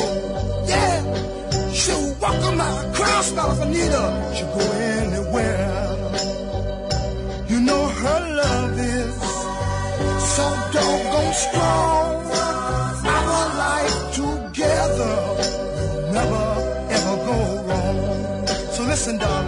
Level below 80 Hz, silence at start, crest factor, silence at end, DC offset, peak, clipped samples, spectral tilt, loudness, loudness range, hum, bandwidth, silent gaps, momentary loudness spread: -32 dBFS; 0 s; 16 dB; 0 s; under 0.1%; -6 dBFS; under 0.1%; -4.5 dB/octave; -21 LUFS; 2 LU; none; 11 kHz; none; 6 LU